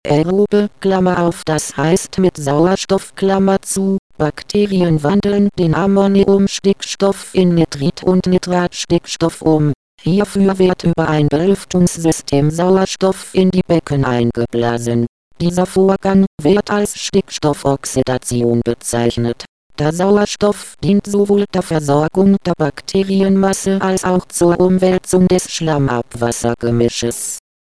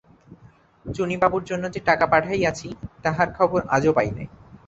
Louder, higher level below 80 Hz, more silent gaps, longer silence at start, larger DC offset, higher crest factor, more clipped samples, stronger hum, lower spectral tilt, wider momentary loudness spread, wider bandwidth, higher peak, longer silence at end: first, -15 LUFS vs -22 LUFS; first, -40 dBFS vs -48 dBFS; first, 3.99-4.10 s, 9.75-9.98 s, 15.09-15.31 s, 16.27-16.38 s, 19.48-19.70 s vs none; second, 0.05 s vs 0.3 s; first, 0.6% vs under 0.1%; second, 12 dB vs 20 dB; neither; neither; about the same, -6 dB/octave vs -6 dB/octave; second, 6 LU vs 16 LU; first, 11 kHz vs 8.2 kHz; about the same, -2 dBFS vs -2 dBFS; first, 0.25 s vs 0.1 s